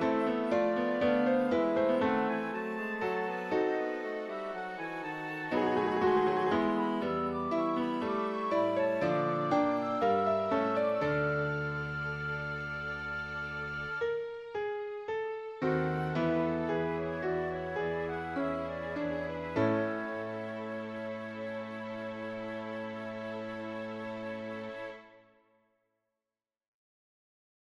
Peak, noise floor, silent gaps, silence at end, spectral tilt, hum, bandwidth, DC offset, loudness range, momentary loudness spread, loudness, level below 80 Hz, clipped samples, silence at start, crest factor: -16 dBFS; under -90 dBFS; none; 2.5 s; -7.5 dB/octave; none; 12 kHz; under 0.1%; 10 LU; 11 LU; -33 LUFS; -60 dBFS; under 0.1%; 0 s; 16 dB